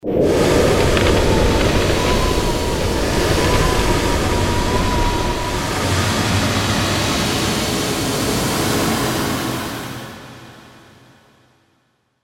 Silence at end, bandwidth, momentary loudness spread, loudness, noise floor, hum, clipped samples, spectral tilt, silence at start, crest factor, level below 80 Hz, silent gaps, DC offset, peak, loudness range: 1.55 s; 16.5 kHz; 6 LU; -17 LUFS; -63 dBFS; none; under 0.1%; -4.5 dB/octave; 0.05 s; 16 dB; -26 dBFS; none; under 0.1%; -2 dBFS; 6 LU